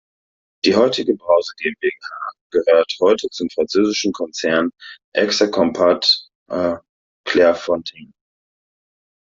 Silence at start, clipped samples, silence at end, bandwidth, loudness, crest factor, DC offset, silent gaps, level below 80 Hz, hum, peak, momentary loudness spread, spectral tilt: 0.65 s; under 0.1%; 1.35 s; 7.8 kHz; -18 LUFS; 16 dB; under 0.1%; 2.41-2.50 s, 5.04-5.12 s, 6.35-6.46 s, 6.89-7.24 s; -60 dBFS; none; -2 dBFS; 10 LU; -3.5 dB/octave